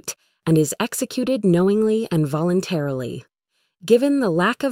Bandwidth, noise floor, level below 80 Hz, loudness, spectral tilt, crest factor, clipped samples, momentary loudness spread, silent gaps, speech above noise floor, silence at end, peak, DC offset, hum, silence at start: 16 kHz; -72 dBFS; -58 dBFS; -20 LUFS; -6 dB/octave; 16 dB; under 0.1%; 12 LU; none; 53 dB; 0 s; -4 dBFS; under 0.1%; none; 0.05 s